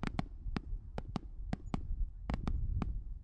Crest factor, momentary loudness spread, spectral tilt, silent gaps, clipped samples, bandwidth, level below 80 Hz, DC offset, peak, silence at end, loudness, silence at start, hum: 22 dB; 6 LU; -7.5 dB/octave; none; under 0.1%; 8.8 kHz; -40 dBFS; under 0.1%; -16 dBFS; 0 s; -42 LUFS; 0 s; none